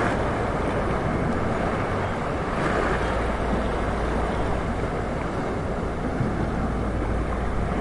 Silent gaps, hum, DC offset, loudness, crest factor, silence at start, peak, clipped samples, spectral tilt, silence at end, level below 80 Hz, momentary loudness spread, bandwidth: none; none; 0.2%; -26 LUFS; 14 dB; 0 s; -10 dBFS; under 0.1%; -7 dB/octave; 0 s; -32 dBFS; 3 LU; 11.5 kHz